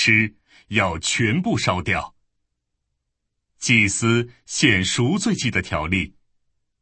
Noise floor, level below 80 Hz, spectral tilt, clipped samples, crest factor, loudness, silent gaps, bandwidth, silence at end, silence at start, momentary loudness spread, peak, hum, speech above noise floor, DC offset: -77 dBFS; -46 dBFS; -4 dB/octave; under 0.1%; 20 dB; -20 LUFS; none; 8.8 kHz; 0.7 s; 0 s; 9 LU; -2 dBFS; none; 57 dB; under 0.1%